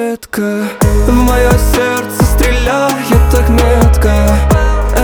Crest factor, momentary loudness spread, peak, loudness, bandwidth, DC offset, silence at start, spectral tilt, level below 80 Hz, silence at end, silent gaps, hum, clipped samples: 10 dB; 6 LU; 0 dBFS; -11 LUFS; over 20 kHz; under 0.1%; 0 s; -6 dB/octave; -12 dBFS; 0 s; none; none; under 0.1%